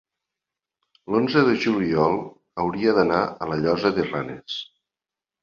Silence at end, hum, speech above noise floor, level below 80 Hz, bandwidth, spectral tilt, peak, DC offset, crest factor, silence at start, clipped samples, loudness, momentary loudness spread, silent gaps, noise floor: 0.8 s; none; 68 dB; -56 dBFS; 7.2 kHz; -7 dB/octave; -4 dBFS; under 0.1%; 20 dB; 1.1 s; under 0.1%; -22 LUFS; 13 LU; none; -89 dBFS